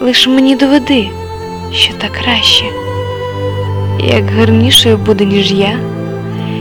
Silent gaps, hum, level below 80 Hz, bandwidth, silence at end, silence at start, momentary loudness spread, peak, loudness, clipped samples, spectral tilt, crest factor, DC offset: none; none; -38 dBFS; 19.5 kHz; 0 s; 0 s; 13 LU; 0 dBFS; -10 LUFS; 0.1%; -4.5 dB/octave; 10 dB; under 0.1%